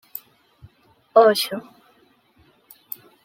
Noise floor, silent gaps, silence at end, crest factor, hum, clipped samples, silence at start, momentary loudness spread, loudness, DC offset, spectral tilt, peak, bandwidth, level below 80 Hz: -59 dBFS; none; 1.65 s; 22 dB; none; under 0.1%; 1.15 s; 22 LU; -18 LUFS; under 0.1%; -3 dB/octave; -2 dBFS; 16.5 kHz; -68 dBFS